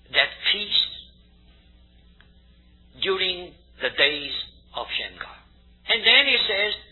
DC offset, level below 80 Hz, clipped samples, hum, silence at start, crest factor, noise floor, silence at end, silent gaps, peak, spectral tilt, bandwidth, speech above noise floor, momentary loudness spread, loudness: under 0.1%; -54 dBFS; under 0.1%; none; 0.1 s; 24 dB; -54 dBFS; 0.1 s; none; -2 dBFS; -3.5 dB/octave; 4.3 kHz; 32 dB; 20 LU; -21 LUFS